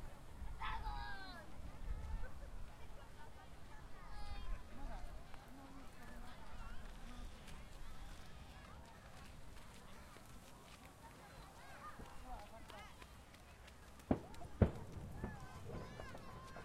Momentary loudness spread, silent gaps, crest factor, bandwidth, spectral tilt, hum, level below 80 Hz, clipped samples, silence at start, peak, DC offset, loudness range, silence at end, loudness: 13 LU; none; 32 dB; 15.5 kHz; -6 dB/octave; none; -52 dBFS; under 0.1%; 0 s; -16 dBFS; under 0.1%; 12 LU; 0 s; -51 LUFS